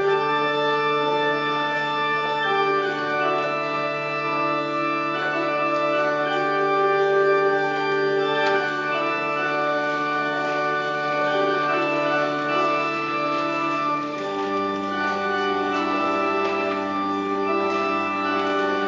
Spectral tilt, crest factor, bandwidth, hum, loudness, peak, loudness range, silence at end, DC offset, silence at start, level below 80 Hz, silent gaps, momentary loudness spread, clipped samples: -5 dB/octave; 14 dB; 7.6 kHz; none; -22 LUFS; -8 dBFS; 2 LU; 0 s; under 0.1%; 0 s; -70 dBFS; none; 4 LU; under 0.1%